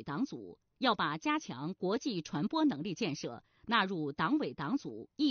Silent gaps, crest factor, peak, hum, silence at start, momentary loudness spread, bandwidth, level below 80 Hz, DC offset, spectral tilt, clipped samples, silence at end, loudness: none; 20 dB; -16 dBFS; none; 0 s; 11 LU; 6.8 kHz; -72 dBFS; under 0.1%; -3.5 dB/octave; under 0.1%; 0 s; -34 LUFS